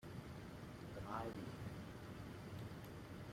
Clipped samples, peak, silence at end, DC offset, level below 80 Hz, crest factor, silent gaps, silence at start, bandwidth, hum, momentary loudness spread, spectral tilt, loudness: under 0.1%; -32 dBFS; 0 s; under 0.1%; -64 dBFS; 20 dB; none; 0 s; 16 kHz; none; 7 LU; -6.5 dB/octave; -52 LUFS